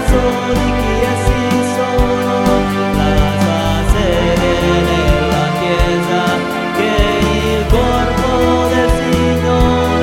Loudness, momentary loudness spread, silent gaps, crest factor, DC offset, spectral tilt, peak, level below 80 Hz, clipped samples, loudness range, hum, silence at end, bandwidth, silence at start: -14 LUFS; 2 LU; none; 12 dB; under 0.1%; -6 dB/octave; 0 dBFS; -20 dBFS; under 0.1%; 1 LU; none; 0 s; 16.5 kHz; 0 s